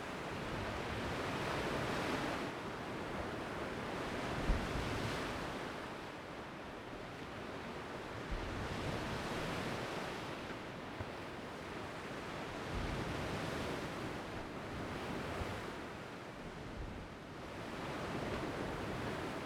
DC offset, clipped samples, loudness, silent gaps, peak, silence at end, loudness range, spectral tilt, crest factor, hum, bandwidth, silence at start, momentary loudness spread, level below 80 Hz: under 0.1%; under 0.1%; -42 LUFS; none; -22 dBFS; 0 s; 5 LU; -5 dB/octave; 20 dB; none; 20 kHz; 0 s; 9 LU; -52 dBFS